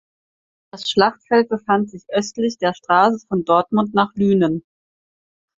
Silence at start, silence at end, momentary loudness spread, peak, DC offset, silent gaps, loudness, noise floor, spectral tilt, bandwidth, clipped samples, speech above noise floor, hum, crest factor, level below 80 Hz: 0.75 s; 1 s; 7 LU; -2 dBFS; under 0.1%; none; -19 LUFS; under -90 dBFS; -5.5 dB/octave; 7.8 kHz; under 0.1%; over 72 dB; none; 18 dB; -58 dBFS